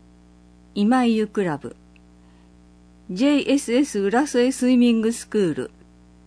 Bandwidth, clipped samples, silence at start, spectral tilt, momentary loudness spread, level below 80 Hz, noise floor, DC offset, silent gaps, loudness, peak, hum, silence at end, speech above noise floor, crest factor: 11 kHz; under 0.1%; 0.75 s; -5 dB/octave; 14 LU; -54 dBFS; -50 dBFS; under 0.1%; none; -21 LUFS; -8 dBFS; 60 Hz at -45 dBFS; 0.6 s; 31 dB; 14 dB